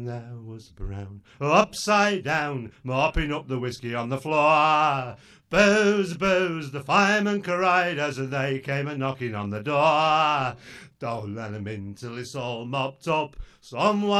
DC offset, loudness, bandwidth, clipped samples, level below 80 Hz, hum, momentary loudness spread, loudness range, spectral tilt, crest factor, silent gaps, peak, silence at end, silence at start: under 0.1%; -24 LUFS; 13 kHz; under 0.1%; -46 dBFS; none; 16 LU; 6 LU; -5 dB/octave; 20 dB; none; -4 dBFS; 0 s; 0 s